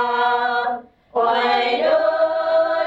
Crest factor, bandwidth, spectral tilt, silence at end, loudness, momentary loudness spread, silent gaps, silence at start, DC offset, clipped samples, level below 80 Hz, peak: 12 dB; 7.6 kHz; -4 dB/octave; 0 s; -19 LUFS; 7 LU; none; 0 s; under 0.1%; under 0.1%; -62 dBFS; -8 dBFS